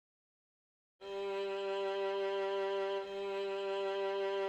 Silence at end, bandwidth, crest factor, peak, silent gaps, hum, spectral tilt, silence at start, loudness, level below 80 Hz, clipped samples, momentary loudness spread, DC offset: 0 s; 8.2 kHz; 10 dB; -28 dBFS; none; none; -4 dB/octave; 1 s; -38 LUFS; -80 dBFS; under 0.1%; 4 LU; under 0.1%